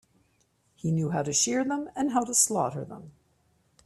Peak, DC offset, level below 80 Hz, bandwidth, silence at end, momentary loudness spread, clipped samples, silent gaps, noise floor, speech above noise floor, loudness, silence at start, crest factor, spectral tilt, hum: -8 dBFS; under 0.1%; -66 dBFS; 15 kHz; 0.75 s; 15 LU; under 0.1%; none; -69 dBFS; 42 dB; -26 LUFS; 0.85 s; 22 dB; -4 dB/octave; none